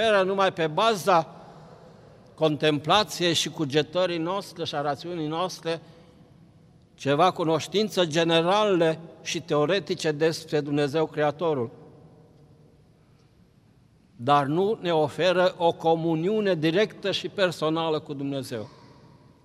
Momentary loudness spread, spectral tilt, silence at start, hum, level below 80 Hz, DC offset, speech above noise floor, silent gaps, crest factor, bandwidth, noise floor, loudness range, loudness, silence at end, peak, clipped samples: 10 LU; -5 dB/octave; 0 s; none; -66 dBFS; under 0.1%; 34 dB; none; 18 dB; 15 kHz; -58 dBFS; 6 LU; -25 LUFS; 0.75 s; -6 dBFS; under 0.1%